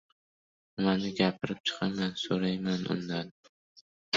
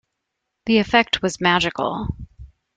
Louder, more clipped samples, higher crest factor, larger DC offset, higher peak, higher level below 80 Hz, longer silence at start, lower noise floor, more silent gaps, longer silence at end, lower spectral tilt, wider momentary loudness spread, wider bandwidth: second, -31 LUFS vs -19 LUFS; neither; about the same, 20 dB vs 20 dB; neither; second, -12 dBFS vs -2 dBFS; second, -66 dBFS vs -44 dBFS; about the same, 0.75 s vs 0.65 s; first, under -90 dBFS vs -79 dBFS; first, 1.60-1.64 s, 3.31-3.43 s, 3.49-4.12 s vs none; second, 0 s vs 0.3 s; about the same, -5.5 dB/octave vs -4.5 dB/octave; second, 7 LU vs 15 LU; second, 7.6 kHz vs 9.2 kHz